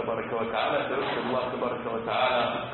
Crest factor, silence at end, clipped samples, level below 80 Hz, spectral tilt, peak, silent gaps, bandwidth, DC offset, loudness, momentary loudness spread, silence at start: 14 dB; 0 s; under 0.1%; -60 dBFS; -9 dB/octave; -14 dBFS; none; 4.3 kHz; under 0.1%; -28 LUFS; 5 LU; 0 s